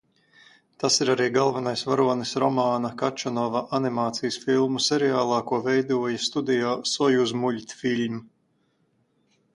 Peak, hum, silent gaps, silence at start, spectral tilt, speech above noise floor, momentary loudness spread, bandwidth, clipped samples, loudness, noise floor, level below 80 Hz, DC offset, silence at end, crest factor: -8 dBFS; none; none; 0.8 s; -4 dB/octave; 45 dB; 6 LU; 11.5 kHz; under 0.1%; -24 LUFS; -69 dBFS; -68 dBFS; under 0.1%; 1.3 s; 18 dB